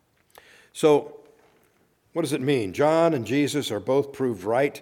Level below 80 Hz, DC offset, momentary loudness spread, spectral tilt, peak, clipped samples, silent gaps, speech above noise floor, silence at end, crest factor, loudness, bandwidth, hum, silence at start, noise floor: -68 dBFS; under 0.1%; 9 LU; -5.5 dB/octave; -8 dBFS; under 0.1%; none; 42 dB; 0 s; 18 dB; -24 LUFS; 17 kHz; none; 0.75 s; -64 dBFS